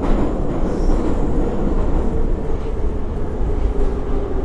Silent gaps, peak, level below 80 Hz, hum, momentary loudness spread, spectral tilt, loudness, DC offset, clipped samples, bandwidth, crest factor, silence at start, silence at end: none; -4 dBFS; -20 dBFS; none; 4 LU; -8.5 dB/octave; -22 LUFS; under 0.1%; under 0.1%; 7.6 kHz; 12 dB; 0 s; 0 s